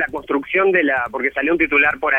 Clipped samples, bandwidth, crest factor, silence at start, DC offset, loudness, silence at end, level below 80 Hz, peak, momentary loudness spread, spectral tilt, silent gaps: under 0.1%; 4.5 kHz; 14 dB; 0 s; under 0.1%; -17 LUFS; 0 s; -48 dBFS; -4 dBFS; 7 LU; -6.5 dB/octave; none